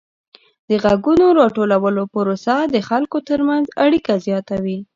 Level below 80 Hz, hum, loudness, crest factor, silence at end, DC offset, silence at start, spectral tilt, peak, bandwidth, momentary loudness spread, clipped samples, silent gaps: -50 dBFS; none; -17 LUFS; 16 dB; 0.1 s; under 0.1%; 0.7 s; -7 dB/octave; 0 dBFS; 7.6 kHz; 8 LU; under 0.1%; none